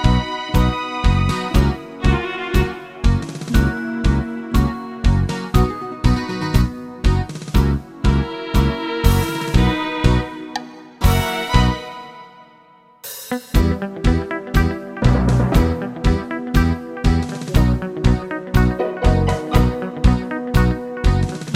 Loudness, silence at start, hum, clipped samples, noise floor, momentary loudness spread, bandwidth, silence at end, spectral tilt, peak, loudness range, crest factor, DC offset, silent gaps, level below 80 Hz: -19 LUFS; 0 s; none; under 0.1%; -49 dBFS; 5 LU; 16 kHz; 0 s; -6.5 dB/octave; 0 dBFS; 3 LU; 16 dB; under 0.1%; none; -22 dBFS